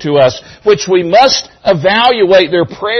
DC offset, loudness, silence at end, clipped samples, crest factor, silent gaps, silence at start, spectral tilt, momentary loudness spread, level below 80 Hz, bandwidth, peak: under 0.1%; -10 LUFS; 0 s; under 0.1%; 10 dB; none; 0 s; -4 dB/octave; 6 LU; -46 dBFS; 6.4 kHz; 0 dBFS